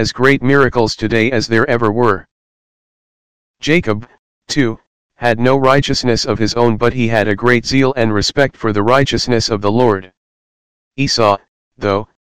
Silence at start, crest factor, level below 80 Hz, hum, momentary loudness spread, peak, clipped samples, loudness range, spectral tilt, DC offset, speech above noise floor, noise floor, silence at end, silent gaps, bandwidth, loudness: 0 s; 16 dB; -38 dBFS; none; 8 LU; 0 dBFS; 0.6%; 5 LU; -5 dB/octave; 4%; over 77 dB; under -90 dBFS; 0.2 s; 2.31-3.54 s, 4.19-4.41 s, 4.87-5.09 s, 10.17-10.91 s, 11.48-11.71 s; 15.5 kHz; -14 LUFS